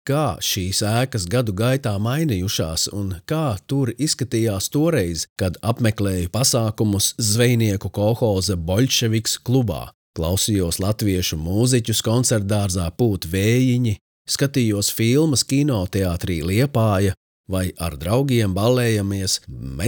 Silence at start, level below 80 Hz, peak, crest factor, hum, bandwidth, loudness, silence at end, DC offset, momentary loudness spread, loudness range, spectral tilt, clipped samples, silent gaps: 0.05 s; -46 dBFS; -4 dBFS; 16 dB; none; over 20 kHz; -20 LUFS; 0 s; under 0.1%; 6 LU; 2 LU; -5 dB/octave; under 0.1%; 5.29-5.36 s, 9.94-10.14 s, 14.01-14.25 s, 17.17-17.44 s